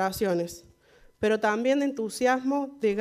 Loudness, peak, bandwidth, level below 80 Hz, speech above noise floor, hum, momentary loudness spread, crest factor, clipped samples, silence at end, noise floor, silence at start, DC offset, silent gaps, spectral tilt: -27 LUFS; -10 dBFS; 15.5 kHz; -60 dBFS; 32 dB; none; 6 LU; 16 dB; under 0.1%; 0 s; -58 dBFS; 0 s; under 0.1%; none; -5 dB/octave